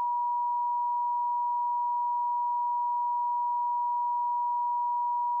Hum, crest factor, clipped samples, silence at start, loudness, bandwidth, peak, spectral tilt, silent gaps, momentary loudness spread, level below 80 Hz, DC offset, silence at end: none; 4 dB; under 0.1%; 0 s; -29 LUFS; 1.1 kHz; -26 dBFS; 8.5 dB/octave; none; 0 LU; under -90 dBFS; under 0.1%; 0 s